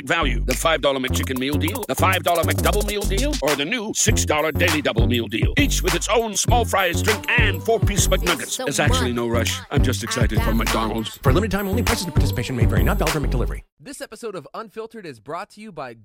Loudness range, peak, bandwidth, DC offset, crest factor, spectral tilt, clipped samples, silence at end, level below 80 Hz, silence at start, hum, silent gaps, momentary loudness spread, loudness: 4 LU; -4 dBFS; 17 kHz; under 0.1%; 16 dB; -4 dB/octave; under 0.1%; 0.1 s; -28 dBFS; 0 s; none; 13.72-13.77 s; 14 LU; -20 LUFS